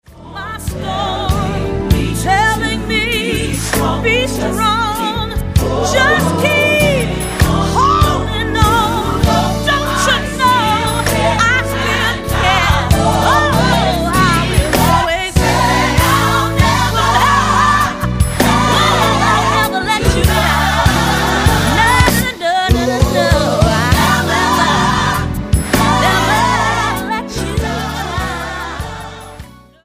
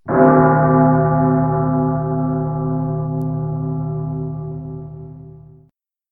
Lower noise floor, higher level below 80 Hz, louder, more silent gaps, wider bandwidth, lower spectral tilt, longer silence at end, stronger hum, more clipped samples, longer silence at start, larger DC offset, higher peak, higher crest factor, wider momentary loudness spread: second, -35 dBFS vs -57 dBFS; first, -24 dBFS vs -42 dBFS; first, -13 LUFS vs -17 LUFS; neither; first, 15.5 kHz vs 2.4 kHz; second, -4.5 dB/octave vs -13.5 dB/octave; second, 0.35 s vs 0.7 s; neither; neither; about the same, 0.1 s vs 0.05 s; second, under 0.1% vs 0.1%; about the same, 0 dBFS vs 0 dBFS; about the same, 14 dB vs 18 dB; second, 8 LU vs 17 LU